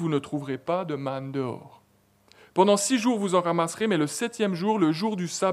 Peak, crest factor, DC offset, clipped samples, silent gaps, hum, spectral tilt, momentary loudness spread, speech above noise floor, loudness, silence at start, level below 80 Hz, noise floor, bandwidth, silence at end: -6 dBFS; 20 dB; under 0.1%; under 0.1%; none; none; -5 dB/octave; 10 LU; 37 dB; -26 LUFS; 0 s; -74 dBFS; -63 dBFS; 15.5 kHz; 0 s